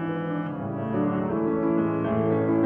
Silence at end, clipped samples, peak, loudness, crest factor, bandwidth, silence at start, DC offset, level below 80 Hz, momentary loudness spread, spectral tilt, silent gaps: 0 s; under 0.1%; -12 dBFS; -26 LUFS; 12 dB; 3.6 kHz; 0 s; under 0.1%; -56 dBFS; 6 LU; -11.5 dB/octave; none